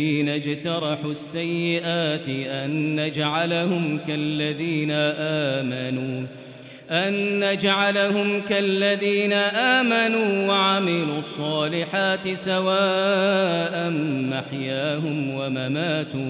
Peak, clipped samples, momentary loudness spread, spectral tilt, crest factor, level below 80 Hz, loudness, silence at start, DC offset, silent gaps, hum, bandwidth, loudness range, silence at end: -6 dBFS; under 0.1%; 8 LU; -10 dB/octave; 18 dB; -68 dBFS; -22 LUFS; 0 s; under 0.1%; none; none; 4 kHz; 4 LU; 0 s